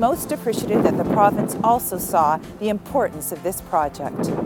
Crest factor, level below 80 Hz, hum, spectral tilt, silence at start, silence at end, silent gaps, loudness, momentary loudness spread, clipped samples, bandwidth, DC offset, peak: 18 dB; -48 dBFS; none; -5.5 dB/octave; 0 s; 0 s; none; -21 LUFS; 8 LU; under 0.1%; 18 kHz; under 0.1%; -2 dBFS